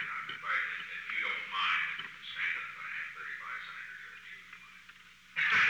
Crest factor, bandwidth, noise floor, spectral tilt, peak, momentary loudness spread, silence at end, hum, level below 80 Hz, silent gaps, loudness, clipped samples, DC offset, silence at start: 18 dB; over 20 kHz; -56 dBFS; -1 dB/octave; -18 dBFS; 19 LU; 0 s; none; -76 dBFS; none; -35 LUFS; under 0.1%; under 0.1%; 0 s